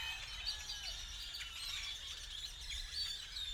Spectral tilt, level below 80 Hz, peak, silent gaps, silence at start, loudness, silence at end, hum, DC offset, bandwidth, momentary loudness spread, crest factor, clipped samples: 0.5 dB/octave; -54 dBFS; -28 dBFS; none; 0 s; -43 LUFS; 0 s; none; under 0.1%; 19.5 kHz; 4 LU; 18 dB; under 0.1%